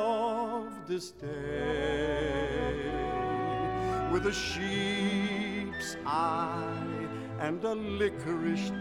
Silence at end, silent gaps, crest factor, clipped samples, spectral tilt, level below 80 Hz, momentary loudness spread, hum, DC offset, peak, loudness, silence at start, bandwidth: 0 s; none; 14 dB; under 0.1%; -5.5 dB/octave; -48 dBFS; 7 LU; none; under 0.1%; -18 dBFS; -32 LUFS; 0 s; 15 kHz